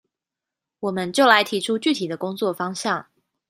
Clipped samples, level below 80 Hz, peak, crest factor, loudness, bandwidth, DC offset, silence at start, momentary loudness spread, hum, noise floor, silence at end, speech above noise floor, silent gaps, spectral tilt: under 0.1%; -70 dBFS; -2 dBFS; 22 dB; -21 LUFS; 15.5 kHz; under 0.1%; 0.8 s; 12 LU; none; -87 dBFS; 0.45 s; 66 dB; none; -3.5 dB/octave